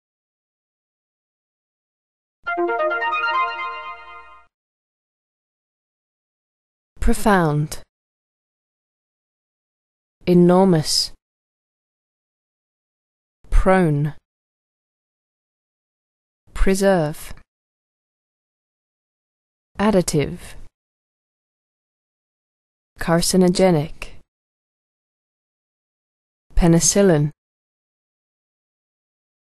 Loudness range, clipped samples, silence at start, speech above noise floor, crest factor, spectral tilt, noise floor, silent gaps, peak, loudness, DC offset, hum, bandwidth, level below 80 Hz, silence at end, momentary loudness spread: 6 LU; under 0.1%; 2.45 s; 26 dB; 20 dB; -5 dB/octave; -43 dBFS; 4.54-6.96 s, 7.89-10.21 s, 11.22-13.44 s, 14.25-16.47 s, 17.48-19.75 s, 20.74-22.96 s, 24.28-26.50 s; -2 dBFS; -18 LUFS; under 0.1%; none; 12.5 kHz; -34 dBFS; 2.15 s; 19 LU